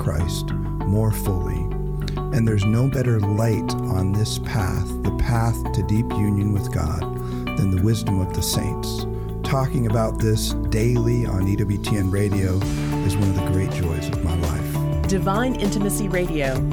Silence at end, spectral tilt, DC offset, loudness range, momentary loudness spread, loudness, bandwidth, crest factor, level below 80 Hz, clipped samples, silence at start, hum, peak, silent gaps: 0 s; -6.5 dB/octave; under 0.1%; 1 LU; 6 LU; -22 LUFS; 18.5 kHz; 14 dB; -30 dBFS; under 0.1%; 0 s; none; -6 dBFS; none